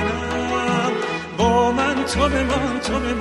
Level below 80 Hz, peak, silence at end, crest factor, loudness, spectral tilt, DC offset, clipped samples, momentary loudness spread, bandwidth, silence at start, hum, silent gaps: -34 dBFS; -4 dBFS; 0 s; 16 dB; -20 LUFS; -5 dB/octave; under 0.1%; under 0.1%; 6 LU; 12.5 kHz; 0 s; none; none